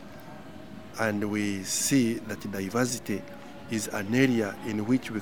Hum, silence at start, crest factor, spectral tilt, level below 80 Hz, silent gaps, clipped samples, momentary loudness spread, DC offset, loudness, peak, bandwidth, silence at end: none; 0 s; 20 dB; -4.5 dB/octave; -60 dBFS; none; under 0.1%; 20 LU; 0.4%; -28 LUFS; -8 dBFS; over 20 kHz; 0 s